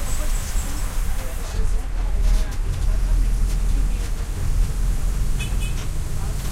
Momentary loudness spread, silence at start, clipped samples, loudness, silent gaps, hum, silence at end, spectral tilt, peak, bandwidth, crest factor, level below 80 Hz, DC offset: 5 LU; 0 s; under 0.1%; -26 LUFS; none; none; 0 s; -4.5 dB/octave; -8 dBFS; 15.5 kHz; 12 dB; -20 dBFS; under 0.1%